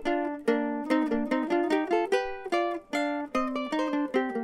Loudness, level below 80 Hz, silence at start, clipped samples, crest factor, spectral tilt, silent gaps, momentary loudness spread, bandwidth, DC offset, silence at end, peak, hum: -28 LUFS; -58 dBFS; 0 s; under 0.1%; 16 dB; -4.5 dB/octave; none; 4 LU; 13 kHz; under 0.1%; 0 s; -12 dBFS; none